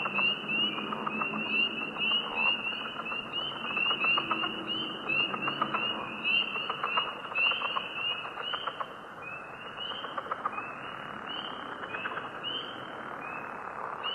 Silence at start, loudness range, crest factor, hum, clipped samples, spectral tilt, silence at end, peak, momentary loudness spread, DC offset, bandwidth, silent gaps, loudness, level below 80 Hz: 0 s; 8 LU; 18 dB; none; under 0.1%; -4 dB/octave; 0 s; -14 dBFS; 13 LU; under 0.1%; 12.5 kHz; none; -31 LUFS; -70 dBFS